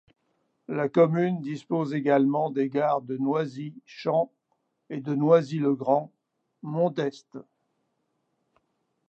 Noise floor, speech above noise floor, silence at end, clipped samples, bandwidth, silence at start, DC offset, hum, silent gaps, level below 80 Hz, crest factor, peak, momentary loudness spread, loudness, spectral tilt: -76 dBFS; 51 dB; 1.7 s; under 0.1%; 8 kHz; 0.7 s; under 0.1%; none; none; -80 dBFS; 20 dB; -8 dBFS; 17 LU; -26 LUFS; -8.5 dB/octave